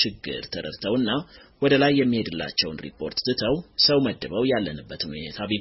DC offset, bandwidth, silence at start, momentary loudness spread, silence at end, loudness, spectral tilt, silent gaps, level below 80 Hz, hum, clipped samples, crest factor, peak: under 0.1%; 6 kHz; 0 s; 13 LU; 0 s; -24 LUFS; -3.5 dB/octave; none; -52 dBFS; none; under 0.1%; 18 dB; -6 dBFS